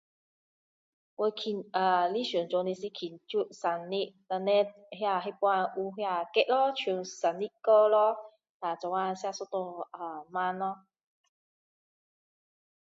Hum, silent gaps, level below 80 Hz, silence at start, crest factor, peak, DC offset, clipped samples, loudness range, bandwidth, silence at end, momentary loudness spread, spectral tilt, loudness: none; 8.50-8.60 s; -86 dBFS; 1.2 s; 20 dB; -10 dBFS; under 0.1%; under 0.1%; 8 LU; 7.8 kHz; 2.2 s; 11 LU; -4.5 dB/octave; -30 LUFS